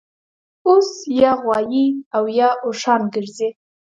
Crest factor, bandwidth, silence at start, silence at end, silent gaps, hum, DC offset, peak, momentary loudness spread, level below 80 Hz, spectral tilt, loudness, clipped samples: 18 dB; 7.8 kHz; 0.65 s; 0.45 s; 2.06-2.11 s; none; under 0.1%; 0 dBFS; 9 LU; -60 dBFS; -5 dB/octave; -18 LUFS; under 0.1%